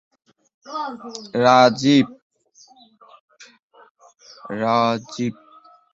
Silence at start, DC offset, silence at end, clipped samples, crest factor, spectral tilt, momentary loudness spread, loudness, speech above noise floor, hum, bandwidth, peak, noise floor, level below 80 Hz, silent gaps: 0.65 s; under 0.1%; 0.6 s; under 0.1%; 20 dB; -5.5 dB/octave; 19 LU; -19 LUFS; 34 dB; none; 7.8 kHz; -2 dBFS; -53 dBFS; -64 dBFS; 2.22-2.30 s, 3.20-3.28 s, 3.63-3.70 s, 3.91-3.95 s